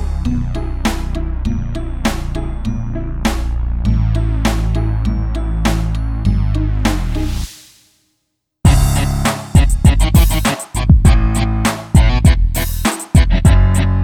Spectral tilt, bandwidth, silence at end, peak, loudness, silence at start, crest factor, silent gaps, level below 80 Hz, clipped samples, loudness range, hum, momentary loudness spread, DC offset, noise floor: -5.5 dB/octave; 18.5 kHz; 0 s; 0 dBFS; -16 LUFS; 0 s; 14 dB; none; -16 dBFS; under 0.1%; 7 LU; none; 11 LU; under 0.1%; -70 dBFS